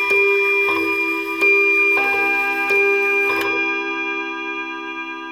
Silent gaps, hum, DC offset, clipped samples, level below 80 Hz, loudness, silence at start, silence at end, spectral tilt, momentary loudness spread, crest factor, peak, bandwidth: none; none; under 0.1%; under 0.1%; -62 dBFS; -16 LUFS; 0 s; 0 s; -3 dB/octave; 12 LU; 12 dB; -6 dBFS; 16.5 kHz